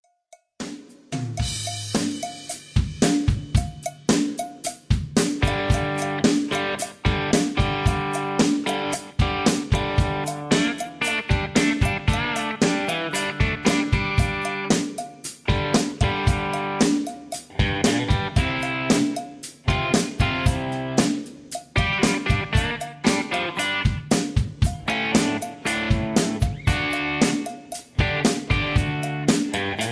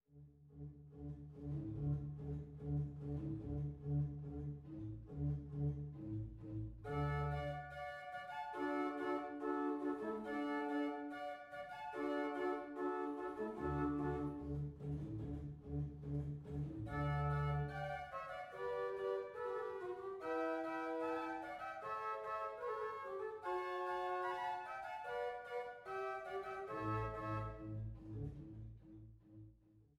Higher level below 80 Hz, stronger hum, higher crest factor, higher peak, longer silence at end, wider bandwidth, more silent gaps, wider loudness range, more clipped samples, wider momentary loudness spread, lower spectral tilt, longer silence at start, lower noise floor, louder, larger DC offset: first, -32 dBFS vs -58 dBFS; neither; about the same, 18 dB vs 16 dB; first, -6 dBFS vs -28 dBFS; second, 0 s vs 0.15 s; about the same, 11 kHz vs 10 kHz; neither; about the same, 1 LU vs 3 LU; neither; about the same, 8 LU vs 9 LU; second, -4.5 dB/octave vs -8.5 dB/octave; first, 0.6 s vs 0.1 s; second, -55 dBFS vs -68 dBFS; first, -23 LUFS vs -44 LUFS; neither